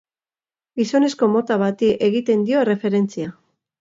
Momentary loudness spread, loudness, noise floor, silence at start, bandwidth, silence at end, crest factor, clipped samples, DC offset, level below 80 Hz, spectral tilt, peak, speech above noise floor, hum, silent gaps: 8 LU; -19 LUFS; under -90 dBFS; 0.75 s; 7.8 kHz; 0.5 s; 16 dB; under 0.1%; under 0.1%; -62 dBFS; -6.5 dB/octave; -4 dBFS; over 72 dB; none; none